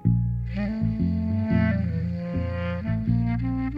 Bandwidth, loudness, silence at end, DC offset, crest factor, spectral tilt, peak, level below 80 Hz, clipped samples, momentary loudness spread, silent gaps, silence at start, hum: 5.2 kHz; -26 LUFS; 0 s; under 0.1%; 16 dB; -10.5 dB/octave; -8 dBFS; -36 dBFS; under 0.1%; 6 LU; none; 0 s; none